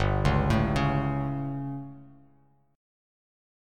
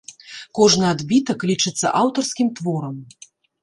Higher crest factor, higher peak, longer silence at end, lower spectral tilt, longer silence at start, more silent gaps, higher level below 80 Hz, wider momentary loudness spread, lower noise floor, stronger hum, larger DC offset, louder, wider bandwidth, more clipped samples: about the same, 20 dB vs 18 dB; second, -10 dBFS vs -2 dBFS; first, 1.65 s vs 0.55 s; first, -7.5 dB/octave vs -4 dB/octave; about the same, 0 s vs 0.1 s; neither; first, -38 dBFS vs -58 dBFS; second, 13 LU vs 17 LU; first, -63 dBFS vs -39 dBFS; neither; neither; second, -27 LUFS vs -19 LUFS; about the same, 10.5 kHz vs 11.5 kHz; neither